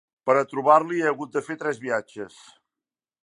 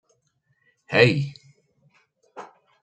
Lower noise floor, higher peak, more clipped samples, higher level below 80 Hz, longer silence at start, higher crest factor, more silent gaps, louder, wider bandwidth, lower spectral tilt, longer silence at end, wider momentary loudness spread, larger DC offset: first, under -90 dBFS vs -70 dBFS; about the same, -4 dBFS vs -2 dBFS; neither; second, -78 dBFS vs -64 dBFS; second, 0.25 s vs 0.9 s; about the same, 22 dB vs 26 dB; neither; about the same, -23 LUFS vs -21 LUFS; first, 11 kHz vs 8.8 kHz; about the same, -5.5 dB/octave vs -6.5 dB/octave; first, 0.95 s vs 0.35 s; second, 18 LU vs 26 LU; neither